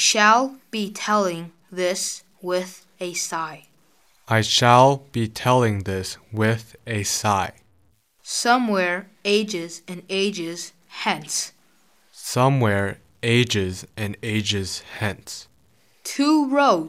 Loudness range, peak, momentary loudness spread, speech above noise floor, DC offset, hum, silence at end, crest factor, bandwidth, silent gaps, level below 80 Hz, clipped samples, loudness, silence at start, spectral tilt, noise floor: 6 LU; -2 dBFS; 16 LU; 41 dB; under 0.1%; none; 0 s; 22 dB; 16 kHz; none; -60 dBFS; under 0.1%; -22 LUFS; 0 s; -4 dB/octave; -62 dBFS